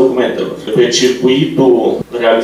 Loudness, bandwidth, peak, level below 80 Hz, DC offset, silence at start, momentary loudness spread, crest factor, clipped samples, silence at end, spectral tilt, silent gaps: -12 LUFS; 13 kHz; 0 dBFS; -50 dBFS; under 0.1%; 0 s; 6 LU; 12 dB; under 0.1%; 0 s; -4.5 dB/octave; none